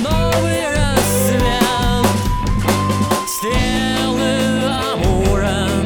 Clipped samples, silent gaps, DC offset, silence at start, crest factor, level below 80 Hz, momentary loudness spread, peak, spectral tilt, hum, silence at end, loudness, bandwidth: under 0.1%; none; 1%; 0 s; 14 dB; -24 dBFS; 3 LU; 0 dBFS; -5 dB/octave; none; 0 s; -16 LUFS; over 20 kHz